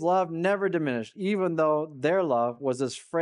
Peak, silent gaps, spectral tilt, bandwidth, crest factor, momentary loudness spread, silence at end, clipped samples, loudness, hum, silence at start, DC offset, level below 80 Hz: -12 dBFS; none; -6 dB/octave; 11.5 kHz; 14 dB; 5 LU; 0 s; under 0.1%; -27 LUFS; none; 0 s; under 0.1%; -76 dBFS